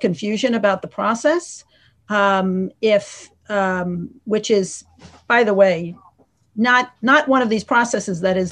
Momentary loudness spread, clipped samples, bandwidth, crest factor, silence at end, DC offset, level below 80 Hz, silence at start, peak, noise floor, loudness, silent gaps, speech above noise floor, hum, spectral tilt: 13 LU; under 0.1%; 10.5 kHz; 18 dB; 0 s; under 0.1%; -62 dBFS; 0 s; -2 dBFS; -55 dBFS; -18 LUFS; none; 37 dB; none; -4.5 dB/octave